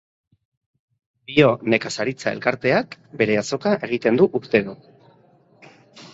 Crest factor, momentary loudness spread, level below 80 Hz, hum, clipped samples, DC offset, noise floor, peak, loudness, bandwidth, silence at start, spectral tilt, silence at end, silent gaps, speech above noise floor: 20 dB; 7 LU; -60 dBFS; none; under 0.1%; under 0.1%; -55 dBFS; -2 dBFS; -20 LUFS; 8 kHz; 1.3 s; -5.5 dB/octave; 0.05 s; none; 35 dB